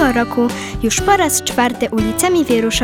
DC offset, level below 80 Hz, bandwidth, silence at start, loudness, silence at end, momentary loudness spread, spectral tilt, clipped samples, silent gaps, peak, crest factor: under 0.1%; -34 dBFS; 19.5 kHz; 0 s; -15 LUFS; 0 s; 5 LU; -3.5 dB/octave; under 0.1%; none; 0 dBFS; 16 dB